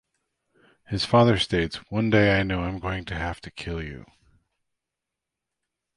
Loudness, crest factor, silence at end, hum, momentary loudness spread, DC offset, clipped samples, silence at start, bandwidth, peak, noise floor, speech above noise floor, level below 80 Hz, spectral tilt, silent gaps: -24 LUFS; 20 dB; 2 s; none; 15 LU; under 0.1%; under 0.1%; 0.9 s; 11.5 kHz; -6 dBFS; -86 dBFS; 62 dB; -44 dBFS; -6.5 dB/octave; none